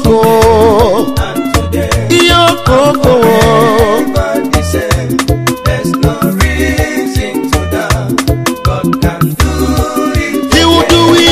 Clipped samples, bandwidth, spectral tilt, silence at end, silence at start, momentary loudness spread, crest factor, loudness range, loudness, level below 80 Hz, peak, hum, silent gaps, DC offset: 0.5%; 16 kHz; -5 dB/octave; 0 s; 0 s; 7 LU; 10 dB; 4 LU; -10 LUFS; -20 dBFS; 0 dBFS; none; none; under 0.1%